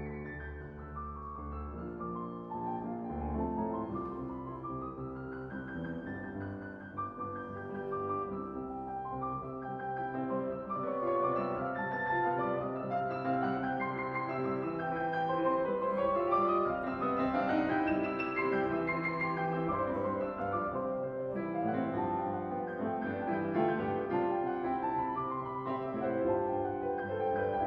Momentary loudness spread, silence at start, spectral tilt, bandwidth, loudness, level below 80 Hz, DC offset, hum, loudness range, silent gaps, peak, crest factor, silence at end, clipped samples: 10 LU; 0 s; -9.5 dB/octave; 5.8 kHz; -35 LUFS; -56 dBFS; under 0.1%; none; 8 LU; none; -18 dBFS; 18 dB; 0 s; under 0.1%